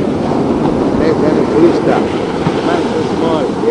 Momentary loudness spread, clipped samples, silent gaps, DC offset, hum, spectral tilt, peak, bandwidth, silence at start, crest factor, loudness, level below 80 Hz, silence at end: 5 LU; under 0.1%; none; 0.2%; none; -7 dB/octave; 0 dBFS; 10 kHz; 0 s; 12 dB; -13 LUFS; -38 dBFS; 0 s